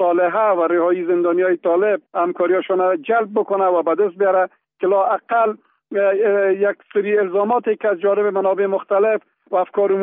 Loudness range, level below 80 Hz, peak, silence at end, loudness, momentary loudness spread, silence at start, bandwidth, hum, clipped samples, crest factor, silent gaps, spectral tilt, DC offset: 1 LU; -76 dBFS; -6 dBFS; 0 s; -18 LUFS; 4 LU; 0 s; 3.8 kHz; none; under 0.1%; 12 dB; none; -0.5 dB/octave; under 0.1%